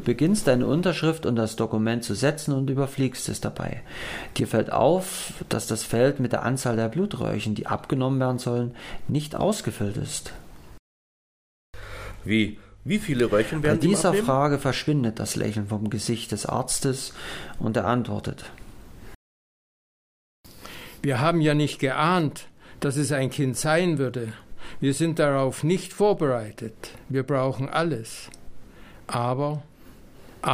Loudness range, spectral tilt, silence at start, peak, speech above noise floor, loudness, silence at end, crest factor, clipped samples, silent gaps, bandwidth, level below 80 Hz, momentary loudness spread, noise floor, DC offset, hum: 7 LU; -5.5 dB/octave; 0 s; -6 dBFS; 23 dB; -25 LUFS; 0 s; 20 dB; under 0.1%; 10.79-11.73 s, 19.15-20.44 s; 16 kHz; -48 dBFS; 14 LU; -47 dBFS; under 0.1%; none